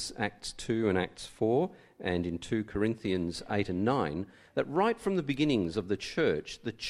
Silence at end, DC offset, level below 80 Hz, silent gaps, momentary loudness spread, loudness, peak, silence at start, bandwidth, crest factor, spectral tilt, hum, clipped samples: 0 s; under 0.1%; -56 dBFS; none; 7 LU; -32 LUFS; -14 dBFS; 0 s; 13 kHz; 18 dB; -5.5 dB/octave; none; under 0.1%